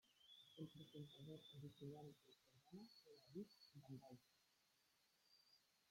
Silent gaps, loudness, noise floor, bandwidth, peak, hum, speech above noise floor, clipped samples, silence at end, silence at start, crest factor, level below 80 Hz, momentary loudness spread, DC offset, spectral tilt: none; -62 LUFS; -83 dBFS; 16 kHz; -42 dBFS; none; 22 dB; under 0.1%; 0 s; 0.05 s; 20 dB; under -90 dBFS; 8 LU; under 0.1%; -6.5 dB/octave